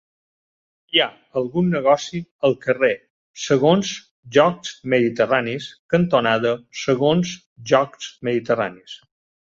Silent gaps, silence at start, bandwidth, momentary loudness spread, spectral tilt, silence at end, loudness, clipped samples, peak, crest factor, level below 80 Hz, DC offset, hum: 2.31-2.39 s, 3.10-3.34 s, 4.11-4.23 s, 5.79-5.89 s, 7.46-7.56 s; 0.95 s; 7.6 kHz; 13 LU; -5 dB/octave; 0.55 s; -20 LUFS; under 0.1%; -2 dBFS; 18 dB; -58 dBFS; under 0.1%; none